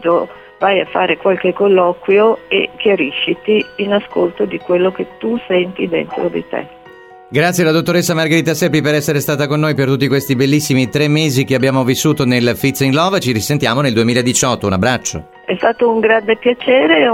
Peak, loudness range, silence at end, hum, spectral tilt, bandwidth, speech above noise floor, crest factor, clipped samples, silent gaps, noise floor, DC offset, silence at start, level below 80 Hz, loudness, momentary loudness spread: 0 dBFS; 3 LU; 0 s; none; -5 dB/octave; 17 kHz; 25 dB; 14 dB; under 0.1%; none; -39 dBFS; under 0.1%; 0 s; -50 dBFS; -14 LUFS; 6 LU